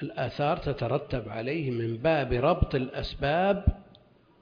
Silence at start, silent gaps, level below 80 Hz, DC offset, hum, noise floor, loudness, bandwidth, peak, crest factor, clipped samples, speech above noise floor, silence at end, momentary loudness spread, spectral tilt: 0 s; none; -40 dBFS; under 0.1%; none; -58 dBFS; -28 LUFS; 5.2 kHz; -8 dBFS; 20 dB; under 0.1%; 31 dB; 0.6 s; 8 LU; -8.5 dB/octave